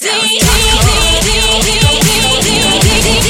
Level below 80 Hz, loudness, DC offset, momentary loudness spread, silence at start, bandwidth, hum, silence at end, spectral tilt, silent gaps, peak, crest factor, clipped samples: -18 dBFS; -8 LUFS; under 0.1%; 1 LU; 0 s; 17 kHz; none; 0 s; -2.5 dB/octave; none; 0 dBFS; 10 dB; under 0.1%